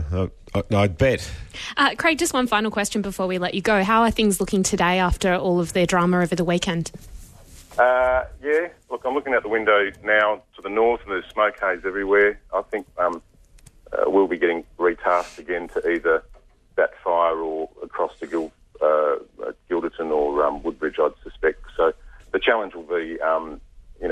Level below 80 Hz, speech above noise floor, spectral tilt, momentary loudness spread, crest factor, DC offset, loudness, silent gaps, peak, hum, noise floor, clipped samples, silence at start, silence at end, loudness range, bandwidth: -42 dBFS; 29 dB; -4.5 dB/octave; 10 LU; 18 dB; under 0.1%; -22 LUFS; none; -4 dBFS; none; -50 dBFS; under 0.1%; 0 s; 0 s; 4 LU; 13.5 kHz